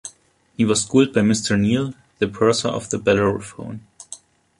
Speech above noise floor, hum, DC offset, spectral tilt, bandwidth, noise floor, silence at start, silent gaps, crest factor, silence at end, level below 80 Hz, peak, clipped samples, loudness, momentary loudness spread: 33 dB; none; under 0.1%; -5 dB/octave; 11.5 kHz; -52 dBFS; 0.05 s; none; 18 dB; 0.45 s; -50 dBFS; -2 dBFS; under 0.1%; -19 LUFS; 21 LU